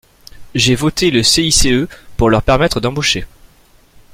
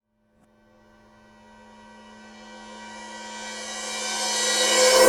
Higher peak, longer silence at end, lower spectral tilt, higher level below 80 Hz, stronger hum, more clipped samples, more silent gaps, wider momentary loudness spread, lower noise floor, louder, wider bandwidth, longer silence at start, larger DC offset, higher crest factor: about the same, 0 dBFS vs -2 dBFS; first, 0.9 s vs 0 s; first, -3.5 dB/octave vs 0.5 dB/octave; first, -28 dBFS vs -62 dBFS; neither; neither; neither; second, 7 LU vs 27 LU; second, -48 dBFS vs -64 dBFS; first, -13 LUFS vs -23 LUFS; about the same, 16.5 kHz vs 18 kHz; second, 0.35 s vs 2.05 s; neither; second, 14 dB vs 24 dB